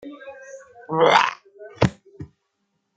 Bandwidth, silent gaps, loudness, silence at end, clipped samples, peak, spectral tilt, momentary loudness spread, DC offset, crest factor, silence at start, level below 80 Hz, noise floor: 9.2 kHz; none; -20 LUFS; 0.7 s; under 0.1%; 0 dBFS; -5 dB/octave; 26 LU; under 0.1%; 24 dB; 0.05 s; -52 dBFS; -74 dBFS